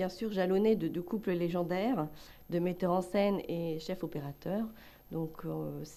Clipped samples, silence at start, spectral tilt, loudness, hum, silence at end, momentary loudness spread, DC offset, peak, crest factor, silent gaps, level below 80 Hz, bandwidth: under 0.1%; 0 s; -7.5 dB/octave; -34 LUFS; none; 0 s; 10 LU; under 0.1%; -18 dBFS; 16 dB; none; -62 dBFS; 14 kHz